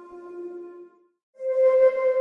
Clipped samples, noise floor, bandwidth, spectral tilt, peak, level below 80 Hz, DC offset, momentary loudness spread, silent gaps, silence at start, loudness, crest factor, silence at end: under 0.1%; -48 dBFS; 3.3 kHz; -5 dB/octave; -10 dBFS; -72 dBFS; under 0.1%; 22 LU; 1.23-1.33 s; 0 s; -21 LUFS; 14 dB; 0 s